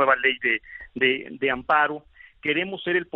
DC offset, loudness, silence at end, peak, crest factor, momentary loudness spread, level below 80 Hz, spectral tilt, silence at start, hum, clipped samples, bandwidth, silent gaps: under 0.1%; -23 LUFS; 0.1 s; -6 dBFS; 18 dB; 8 LU; -60 dBFS; -1 dB/octave; 0 s; none; under 0.1%; 5 kHz; none